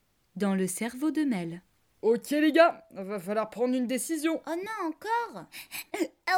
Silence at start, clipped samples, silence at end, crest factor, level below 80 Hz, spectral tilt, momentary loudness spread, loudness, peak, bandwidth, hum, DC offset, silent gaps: 0.35 s; under 0.1%; 0 s; 20 dB; -74 dBFS; -4.5 dB/octave; 15 LU; -29 LUFS; -8 dBFS; 18.5 kHz; none; under 0.1%; none